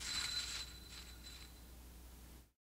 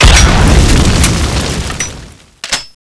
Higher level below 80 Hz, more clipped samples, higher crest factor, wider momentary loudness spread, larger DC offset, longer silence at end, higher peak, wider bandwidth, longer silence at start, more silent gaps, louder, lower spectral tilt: second, -58 dBFS vs -12 dBFS; second, under 0.1% vs 2%; first, 20 dB vs 10 dB; first, 19 LU vs 13 LU; neither; about the same, 0.15 s vs 0.2 s; second, -28 dBFS vs 0 dBFS; first, 16 kHz vs 11 kHz; about the same, 0 s vs 0 s; neither; second, -44 LUFS vs -10 LUFS; second, -0.5 dB/octave vs -4 dB/octave